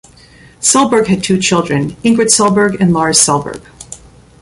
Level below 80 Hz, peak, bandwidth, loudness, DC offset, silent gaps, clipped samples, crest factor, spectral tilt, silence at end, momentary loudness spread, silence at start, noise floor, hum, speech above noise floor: -44 dBFS; 0 dBFS; 16 kHz; -11 LUFS; under 0.1%; none; under 0.1%; 12 dB; -3.5 dB/octave; 0.45 s; 19 LU; 0.6 s; -41 dBFS; none; 30 dB